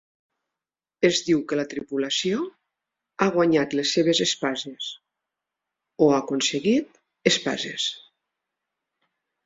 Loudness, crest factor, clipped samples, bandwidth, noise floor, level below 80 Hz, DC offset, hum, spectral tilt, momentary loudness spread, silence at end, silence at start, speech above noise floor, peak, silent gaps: -23 LUFS; 22 dB; under 0.1%; 8 kHz; -90 dBFS; -66 dBFS; under 0.1%; none; -3.5 dB/octave; 12 LU; 1.45 s; 1 s; 67 dB; -2 dBFS; none